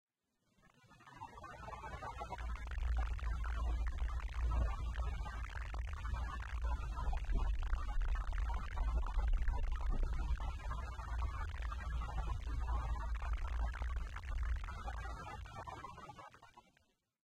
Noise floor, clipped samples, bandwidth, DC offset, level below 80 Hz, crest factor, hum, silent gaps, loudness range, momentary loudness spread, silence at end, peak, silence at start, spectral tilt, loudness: -82 dBFS; under 0.1%; 8.6 kHz; under 0.1%; -40 dBFS; 14 dB; none; none; 4 LU; 9 LU; 0.65 s; -24 dBFS; 0.9 s; -6 dB/octave; -43 LUFS